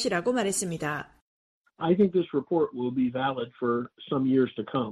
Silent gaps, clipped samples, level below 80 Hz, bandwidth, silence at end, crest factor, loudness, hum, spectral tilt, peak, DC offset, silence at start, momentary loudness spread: 1.21-1.64 s; under 0.1%; -64 dBFS; 13.5 kHz; 0 s; 16 dB; -27 LUFS; none; -5 dB/octave; -12 dBFS; under 0.1%; 0 s; 8 LU